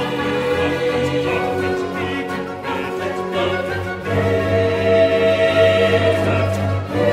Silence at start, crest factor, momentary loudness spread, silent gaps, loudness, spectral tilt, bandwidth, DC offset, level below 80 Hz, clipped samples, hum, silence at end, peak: 0 s; 16 dB; 9 LU; none; -18 LUFS; -6.5 dB/octave; 15 kHz; under 0.1%; -46 dBFS; under 0.1%; none; 0 s; -2 dBFS